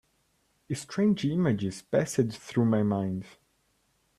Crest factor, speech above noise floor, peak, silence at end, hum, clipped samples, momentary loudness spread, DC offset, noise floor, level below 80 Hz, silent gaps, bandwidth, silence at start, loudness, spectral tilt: 18 dB; 44 dB; -12 dBFS; 0.9 s; none; under 0.1%; 10 LU; under 0.1%; -71 dBFS; -64 dBFS; none; 13 kHz; 0.7 s; -28 LUFS; -6.5 dB/octave